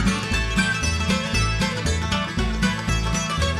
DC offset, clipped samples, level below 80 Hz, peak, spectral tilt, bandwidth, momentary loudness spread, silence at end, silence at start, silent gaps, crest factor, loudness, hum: under 0.1%; under 0.1%; -30 dBFS; -6 dBFS; -4 dB/octave; 14 kHz; 3 LU; 0 s; 0 s; none; 16 dB; -22 LUFS; none